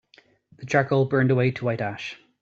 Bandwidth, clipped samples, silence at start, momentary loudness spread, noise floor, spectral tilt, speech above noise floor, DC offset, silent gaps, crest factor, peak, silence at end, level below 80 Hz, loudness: 7.4 kHz; under 0.1%; 0.6 s; 15 LU; -58 dBFS; -7.5 dB/octave; 36 dB; under 0.1%; none; 18 dB; -6 dBFS; 0.25 s; -62 dBFS; -23 LUFS